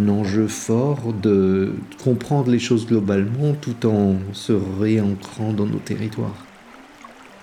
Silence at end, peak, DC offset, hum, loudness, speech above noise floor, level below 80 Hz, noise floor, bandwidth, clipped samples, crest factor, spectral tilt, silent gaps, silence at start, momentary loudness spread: 0.1 s; -4 dBFS; under 0.1%; none; -21 LUFS; 24 dB; -60 dBFS; -44 dBFS; 13.5 kHz; under 0.1%; 16 dB; -7 dB/octave; none; 0 s; 7 LU